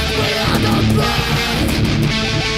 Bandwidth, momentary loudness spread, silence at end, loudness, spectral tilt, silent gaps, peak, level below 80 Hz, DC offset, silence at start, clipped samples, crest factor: 16 kHz; 2 LU; 0 s; -16 LUFS; -5 dB/octave; none; -2 dBFS; -26 dBFS; under 0.1%; 0 s; under 0.1%; 14 dB